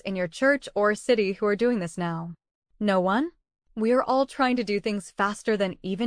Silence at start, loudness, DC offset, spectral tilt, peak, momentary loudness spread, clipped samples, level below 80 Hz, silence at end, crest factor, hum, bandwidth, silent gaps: 0.05 s; -25 LUFS; under 0.1%; -5.5 dB/octave; -10 dBFS; 8 LU; under 0.1%; -60 dBFS; 0 s; 16 dB; none; 10.5 kHz; 2.51-2.62 s